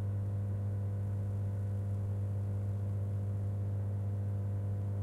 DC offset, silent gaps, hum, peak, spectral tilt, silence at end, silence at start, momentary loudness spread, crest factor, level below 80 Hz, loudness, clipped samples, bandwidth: under 0.1%; none; 50 Hz at -35 dBFS; -28 dBFS; -10 dB/octave; 0 s; 0 s; 0 LU; 6 dB; -56 dBFS; -37 LUFS; under 0.1%; 2.3 kHz